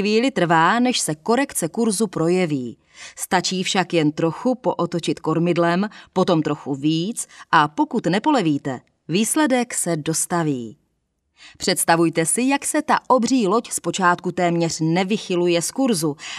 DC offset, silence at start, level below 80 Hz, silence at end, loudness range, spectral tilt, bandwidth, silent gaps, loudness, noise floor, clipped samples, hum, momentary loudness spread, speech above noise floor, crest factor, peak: under 0.1%; 0 s; -64 dBFS; 0 s; 2 LU; -4 dB/octave; 14.5 kHz; none; -20 LUFS; -71 dBFS; under 0.1%; none; 7 LU; 51 dB; 20 dB; 0 dBFS